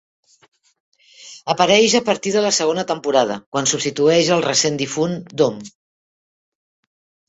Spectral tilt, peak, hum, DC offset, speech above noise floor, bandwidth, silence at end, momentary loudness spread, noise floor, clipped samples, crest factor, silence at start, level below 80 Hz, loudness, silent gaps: -3 dB/octave; -2 dBFS; none; under 0.1%; 25 dB; 8.2 kHz; 1.6 s; 9 LU; -42 dBFS; under 0.1%; 18 dB; 1.2 s; -62 dBFS; -17 LUFS; 3.46-3.52 s